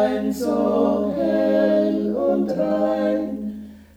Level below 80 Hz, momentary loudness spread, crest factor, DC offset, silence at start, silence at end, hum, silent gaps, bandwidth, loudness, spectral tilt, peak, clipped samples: -52 dBFS; 8 LU; 14 dB; under 0.1%; 0 s; 0.15 s; none; none; 17 kHz; -21 LUFS; -7 dB/octave; -8 dBFS; under 0.1%